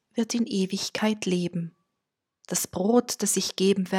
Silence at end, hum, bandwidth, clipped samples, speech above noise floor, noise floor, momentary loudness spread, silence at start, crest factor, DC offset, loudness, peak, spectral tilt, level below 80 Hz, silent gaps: 0 s; none; 17 kHz; under 0.1%; 58 dB; -84 dBFS; 7 LU; 0.15 s; 18 dB; under 0.1%; -26 LUFS; -8 dBFS; -4 dB/octave; -66 dBFS; none